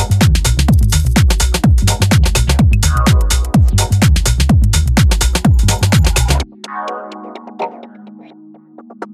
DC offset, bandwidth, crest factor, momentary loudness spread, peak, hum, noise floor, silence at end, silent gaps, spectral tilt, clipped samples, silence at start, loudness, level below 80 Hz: under 0.1%; 15 kHz; 12 dB; 13 LU; 0 dBFS; none; -39 dBFS; 0 s; none; -5 dB/octave; under 0.1%; 0 s; -12 LUFS; -16 dBFS